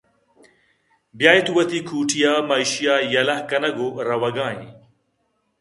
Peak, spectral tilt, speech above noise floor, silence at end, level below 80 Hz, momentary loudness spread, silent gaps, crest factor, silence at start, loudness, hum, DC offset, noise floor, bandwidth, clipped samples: 0 dBFS; -3 dB/octave; 50 dB; 0.9 s; -66 dBFS; 9 LU; none; 22 dB; 1.15 s; -19 LUFS; none; under 0.1%; -70 dBFS; 11.5 kHz; under 0.1%